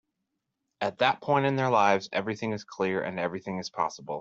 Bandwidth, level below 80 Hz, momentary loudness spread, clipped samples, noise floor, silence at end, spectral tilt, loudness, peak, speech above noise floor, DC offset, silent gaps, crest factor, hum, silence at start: 7.8 kHz; -72 dBFS; 10 LU; under 0.1%; -82 dBFS; 0 s; -5.5 dB/octave; -28 LUFS; -8 dBFS; 55 dB; under 0.1%; none; 22 dB; none; 0.8 s